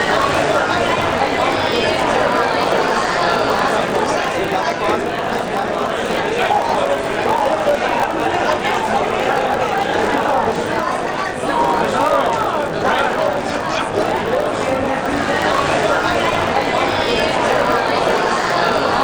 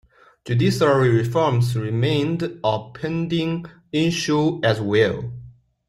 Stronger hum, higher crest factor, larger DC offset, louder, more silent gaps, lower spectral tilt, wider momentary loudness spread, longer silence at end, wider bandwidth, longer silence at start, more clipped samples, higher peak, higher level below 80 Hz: neither; about the same, 14 dB vs 16 dB; neither; first, -17 LUFS vs -21 LUFS; neither; second, -4 dB/octave vs -6.5 dB/octave; second, 4 LU vs 10 LU; second, 0 s vs 0.4 s; first, over 20 kHz vs 13 kHz; second, 0 s vs 0.45 s; neither; about the same, -4 dBFS vs -4 dBFS; first, -42 dBFS vs -54 dBFS